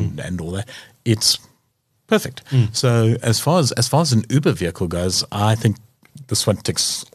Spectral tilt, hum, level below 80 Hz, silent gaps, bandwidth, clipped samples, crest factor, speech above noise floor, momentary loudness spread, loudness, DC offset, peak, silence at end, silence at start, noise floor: -4.5 dB/octave; none; -48 dBFS; none; 14 kHz; under 0.1%; 18 dB; 48 dB; 10 LU; -19 LUFS; under 0.1%; -2 dBFS; 0.1 s; 0 s; -67 dBFS